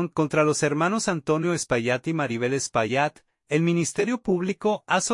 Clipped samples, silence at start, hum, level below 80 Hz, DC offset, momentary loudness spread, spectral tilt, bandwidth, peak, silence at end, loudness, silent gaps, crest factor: under 0.1%; 0 s; none; -60 dBFS; under 0.1%; 4 LU; -5 dB/octave; 11.5 kHz; -8 dBFS; 0 s; -24 LUFS; none; 16 dB